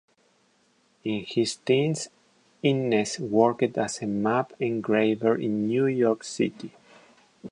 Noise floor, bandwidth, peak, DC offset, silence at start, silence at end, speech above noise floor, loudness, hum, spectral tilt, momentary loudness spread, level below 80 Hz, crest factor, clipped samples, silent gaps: -65 dBFS; 11.5 kHz; -6 dBFS; under 0.1%; 1.05 s; 0 s; 41 dB; -26 LUFS; none; -5.5 dB/octave; 10 LU; -68 dBFS; 20 dB; under 0.1%; none